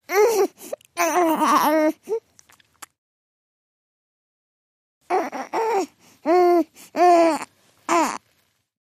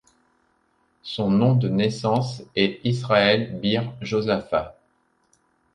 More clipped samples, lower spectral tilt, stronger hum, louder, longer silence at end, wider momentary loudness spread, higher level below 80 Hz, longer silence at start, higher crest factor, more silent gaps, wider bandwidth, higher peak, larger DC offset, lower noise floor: neither; second, -3 dB/octave vs -6.5 dB/octave; neither; about the same, -20 LUFS vs -22 LUFS; second, 0.65 s vs 1.05 s; first, 15 LU vs 8 LU; second, -72 dBFS vs -56 dBFS; second, 0.1 s vs 1.05 s; about the same, 20 dB vs 20 dB; first, 2.98-5.01 s vs none; first, 15.5 kHz vs 10 kHz; about the same, -2 dBFS vs -4 dBFS; neither; about the same, -66 dBFS vs -66 dBFS